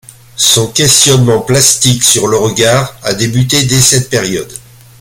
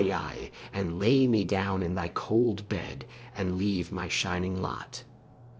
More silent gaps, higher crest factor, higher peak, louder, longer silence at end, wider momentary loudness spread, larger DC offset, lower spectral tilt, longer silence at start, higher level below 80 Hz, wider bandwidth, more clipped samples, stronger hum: neither; second, 10 dB vs 16 dB; first, 0 dBFS vs -12 dBFS; first, -8 LUFS vs -29 LUFS; first, 0.4 s vs 0 s; second, 10 LU vs 15 LU; neither; second, -3 dB/octave vs -6 dB/octave; first, 0.35 s vs 0 s; first, -40 dBFS vs -48 dBFS; first, over 20 kHz vs 8 kHz; first, 0.3% vs under 0.1%; neither